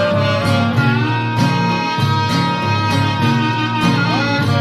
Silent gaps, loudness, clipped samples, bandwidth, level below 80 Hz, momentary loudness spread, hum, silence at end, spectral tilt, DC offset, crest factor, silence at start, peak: none; -16 LUFS; under 0.1%; 13.5 kHz; -46 dBFS; 2 LU; none; 0 s; -6 dB/octave; under 0.1%; 14 dB; 0 s; -2 dBFS